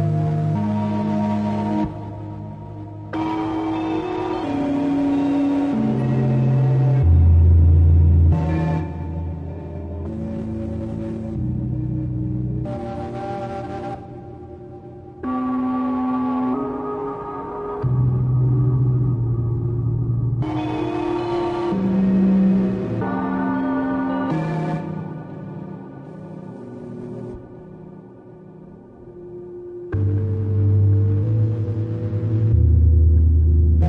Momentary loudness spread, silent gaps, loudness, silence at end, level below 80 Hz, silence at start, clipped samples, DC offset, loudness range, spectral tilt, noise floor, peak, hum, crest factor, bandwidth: 19 LU; none; -21 LUFS; 0 s; -32 dBFS; 0 s; under 0.1%; under 0.1%; 12 LU; -10.5 dB/octave; -41 dBFS; -6 dBFS; none; 14 dB; 4.8 kHz